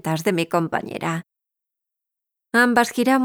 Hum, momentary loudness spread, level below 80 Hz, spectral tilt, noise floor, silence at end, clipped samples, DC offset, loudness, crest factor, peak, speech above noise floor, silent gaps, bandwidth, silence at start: none; 10 LU; -66 dBFS; -5 dB/octave; -85 dBFS; 0 s; under 0.1%; under 0.1%; -21 LUFS; 18 dB; -4 dBFS; 65 dB; none; over 20 kHz; 0.05 s